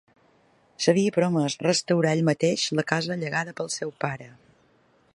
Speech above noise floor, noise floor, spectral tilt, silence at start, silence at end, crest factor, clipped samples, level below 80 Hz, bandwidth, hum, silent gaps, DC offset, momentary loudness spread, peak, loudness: 38 dB; -62 dBFS; -4.5 dB/octave; 0.8 s; 0.85 s; 22 dB; under 0.1%; -68 dBFS; 11.5 kHz; none; none; under 0.1%; 9 LU; -4 dBFS; -25 LUFS